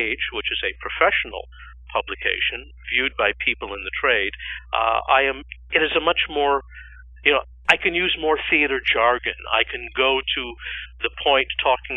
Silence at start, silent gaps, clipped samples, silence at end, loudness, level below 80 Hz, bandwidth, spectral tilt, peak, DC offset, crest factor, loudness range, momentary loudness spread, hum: 0 s; none; under 0.1%; 0 s; -21 LUFS; -44 dBFS; 11 kHz; -4 dB/octave; 0 dBFS; under 0.1%; 22 dB; 3 LU; 10 LU; none